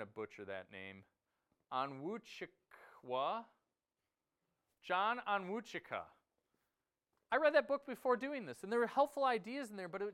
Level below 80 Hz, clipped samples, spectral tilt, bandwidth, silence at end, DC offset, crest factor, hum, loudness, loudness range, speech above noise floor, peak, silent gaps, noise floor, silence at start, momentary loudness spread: -86 dBFS; under 0.1%; -5 dB/octave; 14.5 kHz; 0 s; under 0.1%; 24 dB; none; -39 LUFS; 8 LU; over 51 dB; -18 dBFS; none; under -90 dBFS; 0 s; 17 LU